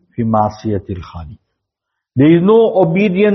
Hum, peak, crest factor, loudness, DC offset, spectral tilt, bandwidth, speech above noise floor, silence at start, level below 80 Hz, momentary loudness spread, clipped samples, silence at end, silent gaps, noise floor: none; 0 dBFS; 14 dB; -13 LUFS; under 0.1%; -7 dB/octave; 6.2 kHz; 65 dB; 0.2 s; -46 dBFS; 18 LU; under 0.1%; 0 s; none; -77 dBFS